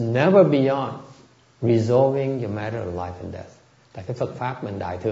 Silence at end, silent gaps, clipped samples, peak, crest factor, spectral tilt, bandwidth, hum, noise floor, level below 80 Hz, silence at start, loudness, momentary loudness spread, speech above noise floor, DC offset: 0 s; none; under 0.1%; -2 dBFS; 20 dB; -8 dB/octave; 7.8 kHz; none; -52 dBFS; -56 dBFS; 0 s; -22 LUFS; 19 LU; 31 dB; under 0.1%